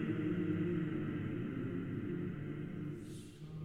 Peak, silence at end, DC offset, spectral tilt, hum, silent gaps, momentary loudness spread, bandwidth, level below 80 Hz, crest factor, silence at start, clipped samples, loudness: -24 dBFS; 0 s; under 0.1%; -8.5 dB/octave; none; none; 11 LU; 11.5 kHz; -60 dBFS; 14 dB; 0 s; under 0.1%; -40 LUFS